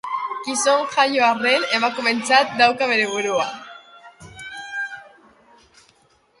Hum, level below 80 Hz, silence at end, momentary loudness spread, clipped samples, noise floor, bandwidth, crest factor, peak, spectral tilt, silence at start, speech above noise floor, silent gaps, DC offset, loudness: none; -64 dBFS; 1.3 s; 18 LU; under 0.1%; -59 dBFS; 11.5 kHz; 20 dB; -2 dBFS; -1.5 dB/octave; 0.05 s; 40 dB; none; under 0.1%; -19 LUFS